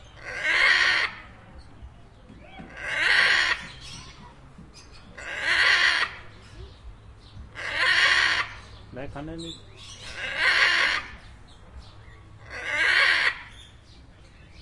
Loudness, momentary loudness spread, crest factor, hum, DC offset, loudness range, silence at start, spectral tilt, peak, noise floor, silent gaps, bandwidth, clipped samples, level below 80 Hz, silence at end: -21 LUFS; 24 LU; 20 dB; none; under 0.1%; 3 LU; 0.05 s; -1 dB/octave; -6 dBFS; -49 dBFS; none; 11.5 kHz; under 0.1%; -50 dBFS; 0 s